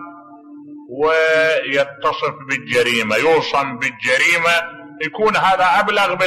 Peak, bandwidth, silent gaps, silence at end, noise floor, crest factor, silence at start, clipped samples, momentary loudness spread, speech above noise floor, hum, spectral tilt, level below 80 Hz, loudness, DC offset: -4 dBFS; 13.5 kHz; none; 0 s; -39 dBFS; 12 dB; 0 s; under 0.1%; 10 LU; 22 dB; none; -3 dB/octave; -56 dBFS; -16 LUFS; under 0.1%